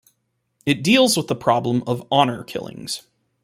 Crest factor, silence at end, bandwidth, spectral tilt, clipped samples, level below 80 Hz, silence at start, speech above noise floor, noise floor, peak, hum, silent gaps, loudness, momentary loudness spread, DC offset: 20 dB; 0.45 s; 16 kHz; -4.5 dB/octave; under 0.1%; -60 dBFS; 0.65 s; 52 dB; -71 dBFS; -2 dBFS; none; none; -20 LUFS; 15 LU; under 0.1%